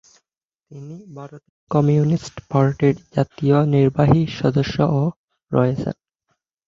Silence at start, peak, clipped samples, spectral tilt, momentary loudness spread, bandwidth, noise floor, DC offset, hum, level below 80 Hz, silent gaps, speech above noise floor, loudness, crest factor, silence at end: 0.7 s; -2 dBFS; under 0.1%; -8.5 dB/octave; 21 LU; 7.4 kHz; -83 dBFS; under 0.1%; none; -48 dBFS; 1.49-1.67 s, 5.16-5.28 s; 65 dB; -19 LUFS; 18 dB; 0.75 s